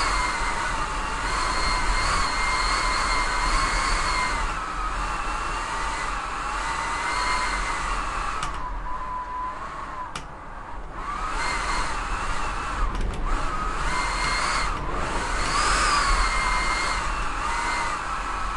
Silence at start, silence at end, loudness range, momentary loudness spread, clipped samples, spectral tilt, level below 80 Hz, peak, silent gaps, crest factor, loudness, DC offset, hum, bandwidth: 0 s; 0 s; 7 LU; 9 LU; under 0.1%; -2.5 dB/octave; -30 dBFS; -10 dBFS; none; 16 dB; -26 LUFS; under 0.1%; none; 11.5 kHz